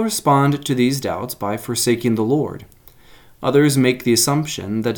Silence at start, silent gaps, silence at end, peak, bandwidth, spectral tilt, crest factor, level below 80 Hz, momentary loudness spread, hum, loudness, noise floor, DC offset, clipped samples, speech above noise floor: 0 s; none; 0 s; -2 dBFS; 19.5 kHz; -5 dB/octave; 16 dB; -52 dBFS; 9 LU; none; -18 LUFS; -46 dBFS; under 0.1%; under 0.1%; 28 dB